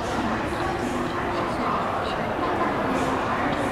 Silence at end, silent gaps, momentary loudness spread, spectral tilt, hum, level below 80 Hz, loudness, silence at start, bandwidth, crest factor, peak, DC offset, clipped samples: 0 s; none; 2 LU; -5.5 dB/octave; none; -42 dBFS; -25 LUFS; 0 s; 16 kHz; 14 dB; -12 dBFS; 0.1%; under 0.1%